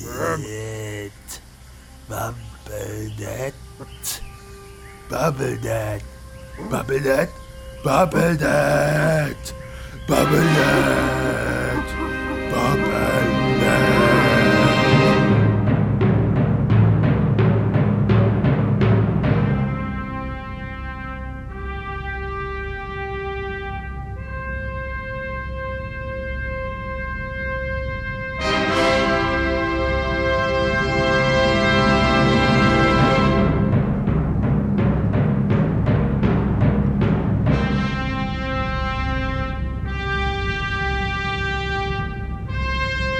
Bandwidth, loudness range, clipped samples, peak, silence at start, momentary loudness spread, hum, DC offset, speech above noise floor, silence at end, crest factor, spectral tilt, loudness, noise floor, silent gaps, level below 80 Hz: 16.5 kHz; 12 LU; under 0.1%; -2 dBFS; 0 s; 15 LU; none; under 0.1%; 23 dB; 0 s; 18 dB; -6.5 dB/octave; -20 LUFS; -43 dBFS; none; -32 dBFS